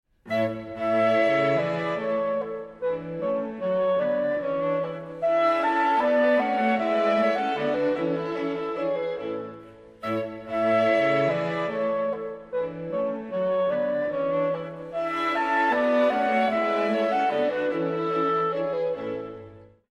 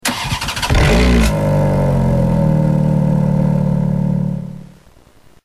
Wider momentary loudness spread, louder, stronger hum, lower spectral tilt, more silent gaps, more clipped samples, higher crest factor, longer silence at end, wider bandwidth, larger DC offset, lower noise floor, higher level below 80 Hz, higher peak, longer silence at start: about the same, 9 LU vs 7 LU; second, -25 LUFS vs -15 LUFS; neither; about the same, -6.5 dB/octave vs -6 dB/octave; neither; neither; about the same, 14 dB vs 12 dB; second, 0.25 s vs 0.75 s; second, 9.2 kHz vs 13.5 kHz; neither; about the same, -47 dBFS vs -46 dBFS; second, -64 dBFS vs -22 dBFS; second, -12 dBFS vs -2 dBFS; first, 0.25 s vs 0.05 s